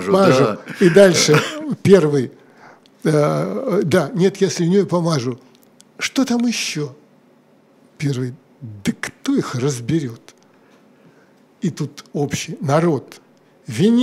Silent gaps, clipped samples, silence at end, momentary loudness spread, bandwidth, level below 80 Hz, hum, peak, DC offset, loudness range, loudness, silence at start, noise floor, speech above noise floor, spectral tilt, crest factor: none; under 0.1%; 0 s; 14 LU; 15.5 kHz; -60 dBFS; none; 0 dBFS; under 0.1%; 9 LU; -18 LUFS; 0 s; -53 dBFS; 36 dB; -5.5 dB/octave; 18 dB